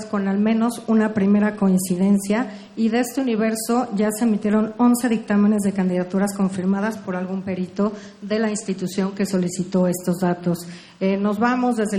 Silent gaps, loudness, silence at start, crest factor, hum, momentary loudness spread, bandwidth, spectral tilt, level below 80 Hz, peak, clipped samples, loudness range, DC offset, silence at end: none; -21 LUFS; 0 s; 14 dB; none; 7 LU; 16 kHz; -6 dB/octave; -60 dBFS; -8 dBFS; under 0.1%; 4 LU; under 0.1%; 0 s